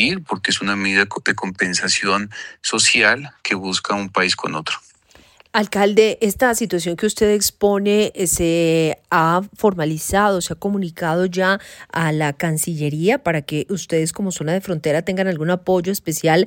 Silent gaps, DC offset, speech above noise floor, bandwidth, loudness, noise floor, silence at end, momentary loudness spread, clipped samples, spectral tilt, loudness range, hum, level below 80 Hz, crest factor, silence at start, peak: none; under 0.1%; 32 dB; 17 kHz; -18 LUFS; -51 dBFS; 0 s; 6 LU; under 0.1%; -4 dB/octave; 3 LU; none; -48 dBFS; 18 dB; 0 s; -2 dBFS